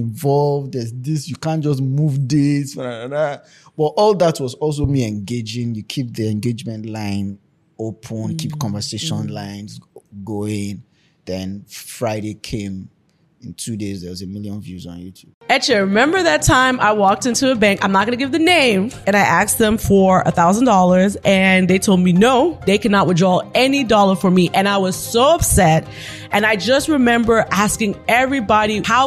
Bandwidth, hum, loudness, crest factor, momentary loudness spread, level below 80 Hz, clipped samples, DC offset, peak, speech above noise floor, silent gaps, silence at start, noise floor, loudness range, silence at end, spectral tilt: 14.5 kHz; none; -16 LUFS; 16 dB; 16 LU; -40 dBFS; under 0.1%; under 0.1%; -2 dBFS; 40 dB; 15.34-15.41 s; 0 s; -57 dBFS; 13 LU; 0 s; -5 dB/octave